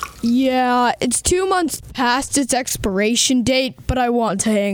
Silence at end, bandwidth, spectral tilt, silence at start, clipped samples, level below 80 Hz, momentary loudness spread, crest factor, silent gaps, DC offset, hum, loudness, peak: 0 s; 19 kHz; -3 dB/octave; 0 s; under 0.1%; -36 dBFS; 5 LU; 14 dB; none; under 0.1%; none; -18 LUFS; -4 dBFS